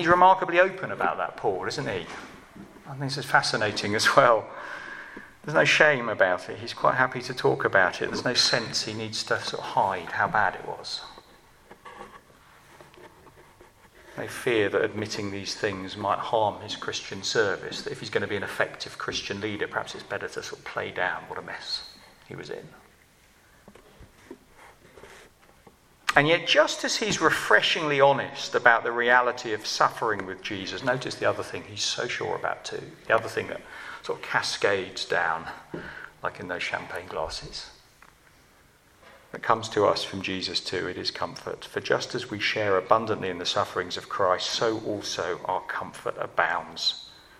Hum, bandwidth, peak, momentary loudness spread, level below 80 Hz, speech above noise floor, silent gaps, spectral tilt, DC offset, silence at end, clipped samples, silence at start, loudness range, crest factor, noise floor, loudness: none; 15.5 kHz; -2 dBFS; 17 LU; -60 dBFS; 32 dB; none; -3 dB/octave; under 0.1%; 0.25 s; under 0.1%; 0 s; 12 LU; 26 dB; -58 dBFS; -26 LUFS